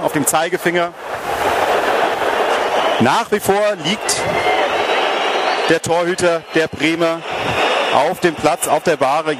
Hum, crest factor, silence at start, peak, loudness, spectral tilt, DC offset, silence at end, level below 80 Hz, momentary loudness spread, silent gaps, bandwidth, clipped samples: none; 16 dB; 0 s; 0 dBFS; -16 LUFS; -3 dB/octave; under 0.1%; 0 s; -50 dBFS; 4 LU; none; 16 kHz; under 0.1%